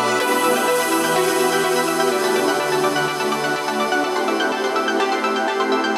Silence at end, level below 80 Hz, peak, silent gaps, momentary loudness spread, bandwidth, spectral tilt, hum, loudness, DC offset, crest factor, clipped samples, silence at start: 0 s; -74 dBFS; -6 dBFS; none; 3 LU; 16 kHz; -2.5 dB/octave; none; -19 LUFS; under 0.1%; 14 dB; under 0.1%; 0 s